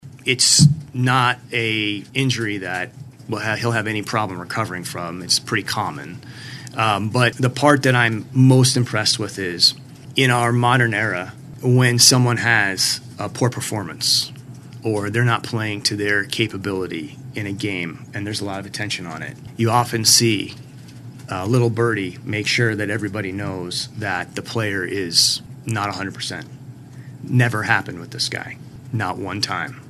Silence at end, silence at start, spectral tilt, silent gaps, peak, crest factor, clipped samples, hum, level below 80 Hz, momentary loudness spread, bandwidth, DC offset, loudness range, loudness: 0 s; 0.05 s; -3.5 dB/octave; none; 0 dBFS; 20 dB; under 0.1%; none; -58 dBFS; 16 LU; 13.5 kHz; under 0.1%; 7 LU; -19 LUFS